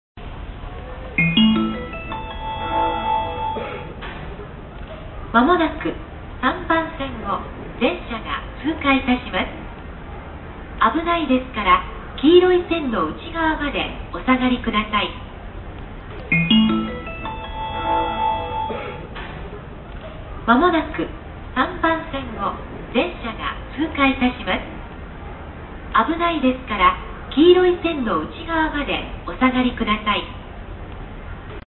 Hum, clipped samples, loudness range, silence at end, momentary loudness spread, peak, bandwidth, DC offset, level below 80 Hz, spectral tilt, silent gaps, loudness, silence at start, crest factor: none; under 0.1%; 5 LU; 0.05 s; 20 LU; -2 dBFS; 4.3 kHz; under 0.1%; -36 dBFS; -10.5 dB/octave; none; -20 LUFS; 0.15 s; 20 dB